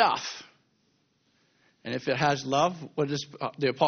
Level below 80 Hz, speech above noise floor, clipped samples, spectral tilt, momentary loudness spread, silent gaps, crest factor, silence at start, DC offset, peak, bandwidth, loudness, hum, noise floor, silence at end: -66 dBFS; 43 dB; under 0.1%; -3.5 dB/octave; 12 LU; none; 22 dB; 0 s; under 0.1%; -8 dBFS; 6.8 kHz; -29 LUFS; none; -70 dBFS; 0 s